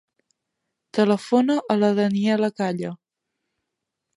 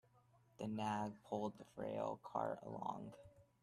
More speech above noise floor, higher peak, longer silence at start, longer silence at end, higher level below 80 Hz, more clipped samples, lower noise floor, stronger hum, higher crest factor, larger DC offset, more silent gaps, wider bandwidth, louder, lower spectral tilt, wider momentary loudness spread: first, 61 dB vs 27 dB; first, -6 dBFS vs -28 dBFS; first, 0.95 s vs 0.6 s; first, 1.2 s vs 0.2 s; first, -70 dBFS vs -78 dBFS; neither; first, -82 dBFS vs -73 dBFS; neither; about the same, 18 dB vs 18 dB; neither; neither; second, 11.5 kHz vs 13 kHz; first, -22 LUFS vs -46 LUFS; about the same, -6.5 dB/octave vs -6.5 dB/octave; about the same, 9 LU vs 9 LU